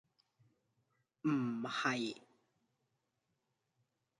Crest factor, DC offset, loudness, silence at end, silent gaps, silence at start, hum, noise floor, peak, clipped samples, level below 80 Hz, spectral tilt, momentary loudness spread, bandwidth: 22 dB; under 0.1%; -38 LUFS; 2 s; none; 1.25 s; none; -85 dBFS; -22 dBFS; under 0.1%; -88 dBFS; -5 dB/octave; 7 LU; 11 kHz